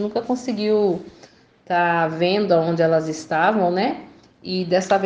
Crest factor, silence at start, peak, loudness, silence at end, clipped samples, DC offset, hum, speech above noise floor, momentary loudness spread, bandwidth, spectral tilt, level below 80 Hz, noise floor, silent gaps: 16 dB; 0 s; -4 dBFS; -20 LUFS; 0 s; under 0.1%; under 0.1%; none; 30 dB; 8 LU; 9.6 kHz; -5.5 dB/octave; -62 dBFS; -50 dBFS; none